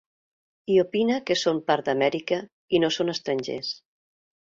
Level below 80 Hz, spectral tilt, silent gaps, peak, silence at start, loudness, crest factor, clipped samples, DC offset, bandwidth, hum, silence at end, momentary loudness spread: -66 dBFS; -4.5 dB/octave; 2.52-2.68 s; -8 dBFS; 0.7 s; -25 LUFS; 18 dB; under 0.1%; under 0.1%; 7.6 kHz; none; 0.75 s; 9 LU